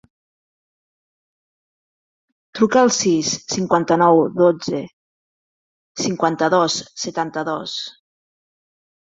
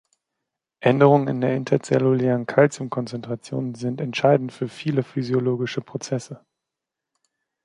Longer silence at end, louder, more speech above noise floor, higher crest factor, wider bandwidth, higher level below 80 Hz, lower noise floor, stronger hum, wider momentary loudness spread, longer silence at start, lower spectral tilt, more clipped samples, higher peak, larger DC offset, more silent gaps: about the same, 1.2 s vs 1.25 s; first, -18 LUFS vs -22 LUFS; first, over 72 dB vs 64 dB; about the same, 20 dB vs 20 dB; second, 7.8 kHz vs 11 kHz; about the same, -64 dBFS vs -66 dBFS; first, under -90 dBFS vs -85 dBFS; neither; about the same, 13 LU vs 13 LU; first, 2.55 s vs 0.8 s; second, -4 dB/octave vs -7 dB/octave; neither; about the same, -2 dBFS vs -2 dBFS; neither; first, 4.93-5.95 s vs none